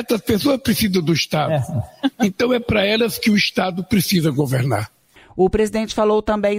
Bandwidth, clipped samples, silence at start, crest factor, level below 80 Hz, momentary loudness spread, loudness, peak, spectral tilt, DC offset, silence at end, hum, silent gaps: 16 kHz; under 0.1%; 0 s; 14 dB; -42 dBFS; 6 LU; -18 LUFS; -6 dBFS; -5.5 dB/octave; under 0.1%; 0 s; none; none